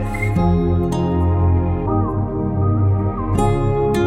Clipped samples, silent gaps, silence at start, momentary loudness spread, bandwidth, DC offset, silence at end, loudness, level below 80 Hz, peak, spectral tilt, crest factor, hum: under 0.1%; none; 0 s; 3 LU; 11.5 kHz; under 0.1%; 0 s; -18 LUFS; -28 dBFS; -4 dBFS; -8.5 dB/octave; 14 dB; none